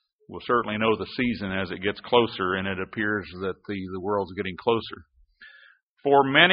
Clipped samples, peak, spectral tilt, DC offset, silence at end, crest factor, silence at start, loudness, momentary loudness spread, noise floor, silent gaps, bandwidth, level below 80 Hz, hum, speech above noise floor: under 0.1%; 0 dBFS; -2.5 dB/octave; under 0.1%; 0 s; 26 dB; 0.3 s; -25 LUFS; 12 LU; -56 dBFS; 5.83-5.96 s; 5.4 kHz; -58 dBFS; none; 31 dB